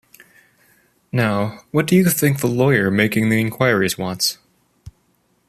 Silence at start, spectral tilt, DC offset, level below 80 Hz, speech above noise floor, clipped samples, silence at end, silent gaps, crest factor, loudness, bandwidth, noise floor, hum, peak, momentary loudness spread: 1.15 s; -5 dB/octave; under 0.1%; -54 dBFS; 45 dB; under 0.1%; 0.6 s; none; 18 dB; -18 LUFS; 15 kHz; -63 dBFS; none; -2 dBFS; 6 LU